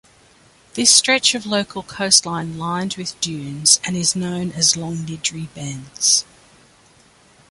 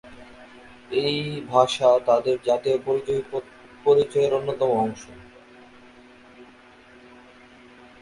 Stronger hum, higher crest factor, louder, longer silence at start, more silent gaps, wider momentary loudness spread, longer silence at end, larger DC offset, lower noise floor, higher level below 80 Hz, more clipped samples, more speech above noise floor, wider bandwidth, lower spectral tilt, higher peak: neither; about the same, 20 dB vs 22 dB; first, -17 LUFS vs -22 LUFS; first, 0.75 s vs 0.05 s; neither; first, 16 LU vs 10 LU; second, 1.3 s vs 1.55 s; neither; about the same, -52 dBFS vs -50 dBFS; about the same, -56 dBFS vs -60 dBFS; neither; first, 32 dB vs 28 dB; about the same, 12 kHz vs 11.5 kHz; second, -1.5 dB/octave vs -5 dB/octave; first, 0 dBFS vs -4 dBFS